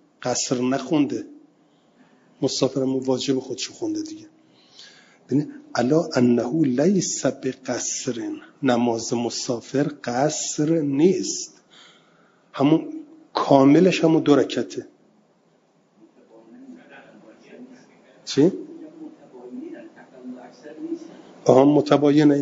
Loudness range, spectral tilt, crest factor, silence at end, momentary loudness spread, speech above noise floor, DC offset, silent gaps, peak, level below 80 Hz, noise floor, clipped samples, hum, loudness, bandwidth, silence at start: 9 LU; -5 dB/octave; 22 dB; 0 s; 23 LU; 41 dB; under 0.1%; none; 0 dBFS; -68 dBFS; -61 dBFS; under 0.1%; none; -21 LUFS; 7.8 kHz; 0.2 s